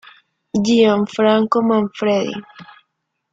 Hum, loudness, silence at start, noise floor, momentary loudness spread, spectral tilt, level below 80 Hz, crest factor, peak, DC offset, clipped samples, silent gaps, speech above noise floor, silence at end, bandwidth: none; -17 LUFS; 0.55 s; -73 dBFS; 10 LU; -5.5 dB/octave; -58 dBFS; 16 dB; -2 dBFS; under 0.1%; under 0.1%; none; 57 dB; 0.7 s; 7.8 kHz